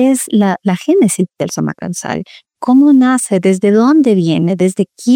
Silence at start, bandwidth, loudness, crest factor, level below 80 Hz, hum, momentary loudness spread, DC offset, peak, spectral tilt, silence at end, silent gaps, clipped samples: 0 s; 16.5 kHz; -12 LUFS; 10 dB; -58 dBFS; none; 12 LU; under 0.1%; -2 dBFS; -6 dB/octave; 0 s; none; under 0.1%